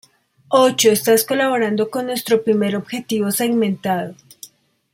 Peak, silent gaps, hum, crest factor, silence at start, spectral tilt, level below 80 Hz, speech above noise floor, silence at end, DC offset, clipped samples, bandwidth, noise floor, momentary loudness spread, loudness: 0 dBFS; none; none; 18 dB; 0.5 s; -4 dB/octave; -64 dBFS; 27 dB; 0.45 s; under 0.1%; under 0.1%; 16.5 kHz; -44 dBFS; 10 LU; -18 LUFS